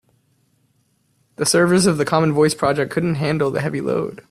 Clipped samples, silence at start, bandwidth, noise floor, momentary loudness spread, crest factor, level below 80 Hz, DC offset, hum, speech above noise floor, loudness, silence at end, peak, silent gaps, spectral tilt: under 0.1%; 1.4 s; 14 kHz; -64 dBFS; 7 LU; 16 dB; -54 dBFS; under 0.1%; none; 46 dB; -18 LUFS; 0.15 s; -2 dBFS; none; -5 dB/octave